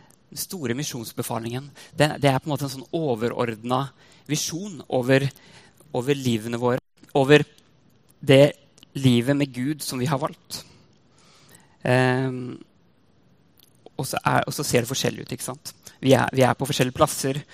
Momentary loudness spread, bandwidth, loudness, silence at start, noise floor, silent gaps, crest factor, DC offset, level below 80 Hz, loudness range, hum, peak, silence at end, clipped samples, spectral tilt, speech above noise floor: 15 LU; 15.5 kHz; -23 LUFS; 0.3 s; -61 dBFS; none; 24 dB; under 0.1%; -58 dBFS; 6 LU; none; 0 dBFS; 0.1 s; under 0.1%; -5 dB/octave; 38 dB